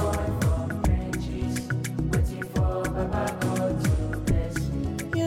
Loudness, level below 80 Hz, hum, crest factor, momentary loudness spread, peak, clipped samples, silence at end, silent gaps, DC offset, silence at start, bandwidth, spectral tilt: -27 LUFS; -32 dBFS; none; 12 dB; 4 LU; -14 dBFS; under 0.1%; 0 s; none; under 0.1%; 0 s; 16.5 kHz; -6.5 dB/octave